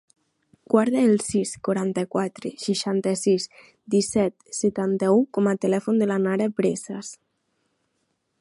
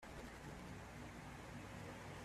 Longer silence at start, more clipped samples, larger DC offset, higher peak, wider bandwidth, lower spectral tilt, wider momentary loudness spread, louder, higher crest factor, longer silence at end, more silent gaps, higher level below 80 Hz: first, 0.7 s vs 0 s; neither; neither; first, -4 dBFS vs -40 dBFS; second, 11.5 kHz vs 14.5 kHz; about the same, -5.5 dB/octave vs -5 dB/octave; first, 9 LU vs 1 LU; first, -23 LUFS vs -54 LUFS; first, 20 dB vs 12 dB; first, 1.25 s vs 0 s; neither; about the same, -64 dBFS vs -64 dBFS